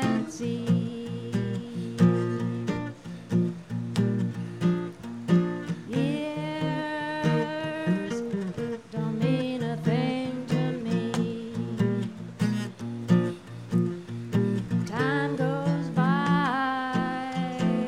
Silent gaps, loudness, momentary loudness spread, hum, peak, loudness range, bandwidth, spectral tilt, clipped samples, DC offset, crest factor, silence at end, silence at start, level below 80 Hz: none; -28 LUFS; 9 LU; none; -8 dBFS; 3 LU; 11 kHz; -7.5 dB/octave; under 0.1%; under 0.1%; 18 dB; 0 s; 0 s; -60 dBFS